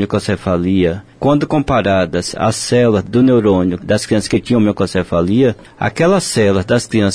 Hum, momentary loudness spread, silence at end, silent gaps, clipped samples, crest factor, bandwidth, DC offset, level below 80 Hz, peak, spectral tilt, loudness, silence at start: none; 5 LU; 0 s; none; under 0.1%; 10 dB; 11 kHz; under 0.1%; -40 dBFS; -2 dBFS; -6 dB/octave; -14 LUFS; 0 s